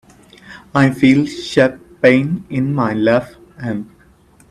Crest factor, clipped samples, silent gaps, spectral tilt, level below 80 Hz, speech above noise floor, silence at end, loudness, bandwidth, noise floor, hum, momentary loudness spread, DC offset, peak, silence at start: 16 dB; under 0.1%; none; -7 dB/octave; -50 dBFS; 34 dB; 0.65 s; -15 LUFS; 12 kHz; -49 dBFS; none; 14 LU; under 0.1%; 0 dBFS; 0.45 s